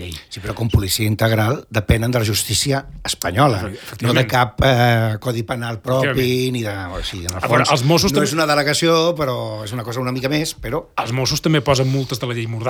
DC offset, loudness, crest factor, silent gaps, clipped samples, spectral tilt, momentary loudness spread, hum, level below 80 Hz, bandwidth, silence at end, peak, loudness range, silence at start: under 0.1%; -18 LUFS; 16 dB; none; under 0.1%; -4.5 dB/octave; 10 LU; none; -36 dBFS; over 20 kHz; 0 s; -2 dBFS; 2 LU; 0 s